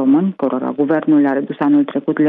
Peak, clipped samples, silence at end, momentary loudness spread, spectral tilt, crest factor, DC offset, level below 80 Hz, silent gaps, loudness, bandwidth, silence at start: -4 dBFS; under 0.1%; 0 s; 5 LU; -10.5 dB/octave; 10 dB; under 0.1%; -68 dBFS; none; -16 LUFS; 3.8 kHz; 0 s